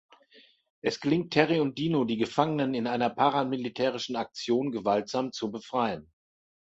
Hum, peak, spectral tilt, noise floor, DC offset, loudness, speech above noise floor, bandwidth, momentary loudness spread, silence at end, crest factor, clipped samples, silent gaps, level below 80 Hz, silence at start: none; -6 dBFS; -6 dB/octave; -60 dBFS; under 0.1%; -28 LUFS; 32 dB; 8 kHz; 8 LU; 0.65 s; 22 dB; under 0.1%; none; -68 dBFS; 0.85 s